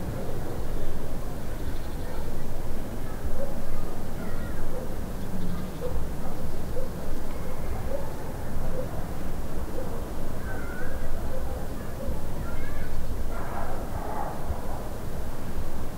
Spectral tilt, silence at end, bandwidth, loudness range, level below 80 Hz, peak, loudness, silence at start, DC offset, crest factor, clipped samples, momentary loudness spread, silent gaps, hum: -6.5 dB/octave; 0 s; 15.5 kHz; 1 LU; -30 dBFS; -12 dBFS; -35 LUFS; 0 s; under 0.1%; 12 dB; under 0.1%; 2 LU; none; none